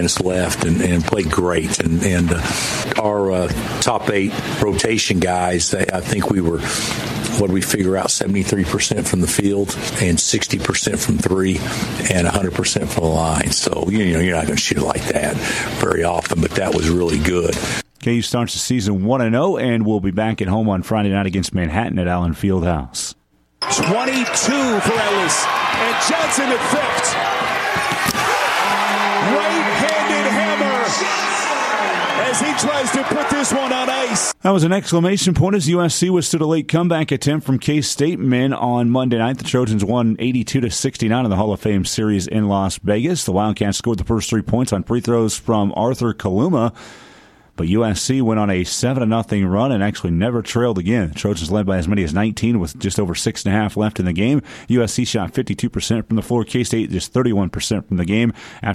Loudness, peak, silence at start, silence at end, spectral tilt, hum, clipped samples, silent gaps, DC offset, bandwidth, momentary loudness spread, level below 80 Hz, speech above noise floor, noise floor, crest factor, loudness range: -18 LUFS; -2 dBFS; 0 s; 0 s; -4.5 dB/octave; none; under 0.1%; none; under 0.1%; 16 kHz; 4 LU; -38 dBFS; 29 dB; -47 dBFS; 16 dB; 3 LU